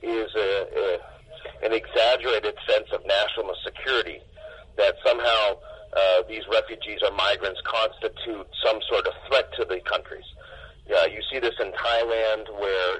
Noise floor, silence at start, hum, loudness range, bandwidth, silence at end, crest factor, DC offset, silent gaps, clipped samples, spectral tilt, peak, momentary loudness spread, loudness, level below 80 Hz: -45 dBFS; 0 s; none; 3 LU; 9 kHz; 0 s; 18 dB; under 0.1%; none; under 0.1%; -3.5 dB/octave; -8 dBFS; 15 LU; -24 LUFS; -52 dBFS